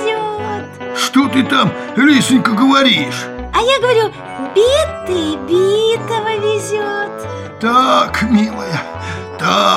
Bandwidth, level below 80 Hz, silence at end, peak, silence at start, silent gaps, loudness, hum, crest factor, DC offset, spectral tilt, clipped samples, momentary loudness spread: 15.5 kHz; -42 dBFS; 0 s; 0 dBFS; 0 s; none; -14 LUFS; none; 14 dB; under 0.1%; -4.5 dB/octave; under 0.1%; 12 LU